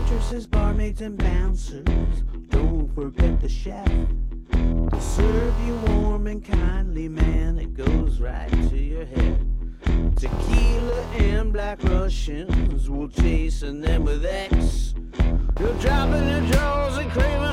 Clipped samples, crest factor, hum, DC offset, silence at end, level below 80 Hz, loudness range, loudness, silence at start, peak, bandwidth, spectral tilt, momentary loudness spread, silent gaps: under 0.1%; 14 dB; none; under 0.1%; 0 s; -22 dBFS; 2 LU; -24 LUFS; 0 s; -6 dBFS; 11 kHz; -7 dB/octave; 7 LU; none